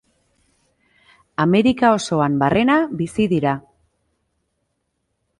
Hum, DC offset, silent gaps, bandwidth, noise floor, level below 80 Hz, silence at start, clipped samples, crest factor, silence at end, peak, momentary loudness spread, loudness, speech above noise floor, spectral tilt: none; under 0.1%; none; 11.5 kHz; -73 dBFS; -52 dBFS; 1.4 s; under 0.1%; 18 dB; 1.8 s; -2 dBFS; 8 LU; -18 LUFS; 56 dB; -6.5 dB/octave